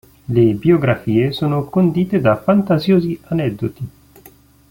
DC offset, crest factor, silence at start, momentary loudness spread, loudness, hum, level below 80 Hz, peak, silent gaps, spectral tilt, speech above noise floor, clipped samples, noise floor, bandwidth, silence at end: under 0.1%; 14 dB; 0.3 s; 8 LU; -16 LUFS; none; -48 dBFS; -2 dBFS; none; -9 dB/octave; 31 dB; under 0.1%; -47 dBFS; 17 kHz; 0.85 s